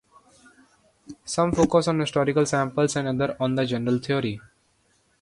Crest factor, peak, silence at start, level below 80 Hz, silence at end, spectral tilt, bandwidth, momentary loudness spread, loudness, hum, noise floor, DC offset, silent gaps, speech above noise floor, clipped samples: 18 dB; -6 dBFS; 1.1 s; -52 dBFS; 0.8 s; -5.5 dB/octave; 11.5 kHz; 8 LU; -24 LUFS; none; -65 dBFS; under 0.1%; none; 43 dB; under 0.1%